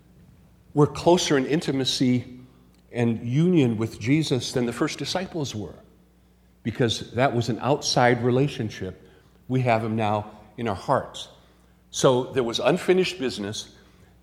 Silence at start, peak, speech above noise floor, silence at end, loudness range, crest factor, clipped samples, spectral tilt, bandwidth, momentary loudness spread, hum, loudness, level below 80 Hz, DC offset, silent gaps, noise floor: 0.75 s; -6 dBFS; 34 dB; 0.55 s; 4 LU; 20 dB; under 0.1%; -5.5 dB/octave; 15.5 kHz; 15 LU; none; -24 LUFS; -56 dBFS; under 0.1%; none; -57 dBFS